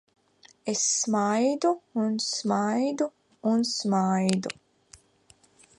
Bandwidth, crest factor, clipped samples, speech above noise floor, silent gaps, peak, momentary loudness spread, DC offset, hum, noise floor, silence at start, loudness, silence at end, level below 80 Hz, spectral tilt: 11.5 kHz; 20 dB; under 0.1%; 35 dB; none; -8 dBFS; 8 LU; under 0.1%; none; -61 dBFS; 0.65 s; -26 LUFS; 1.25 s; -72 dBFS; -4 dB/octave